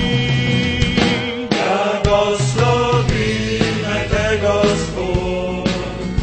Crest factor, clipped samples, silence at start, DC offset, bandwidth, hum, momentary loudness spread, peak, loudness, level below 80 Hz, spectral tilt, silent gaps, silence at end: 16 dB; under 0.1%; 0 s; under 0.1%; 8.8 kHz; none; 5 LU; 0 dBFS; -17 LUFS; -30 dBFS; -5.5 dB/octave; none; 0 s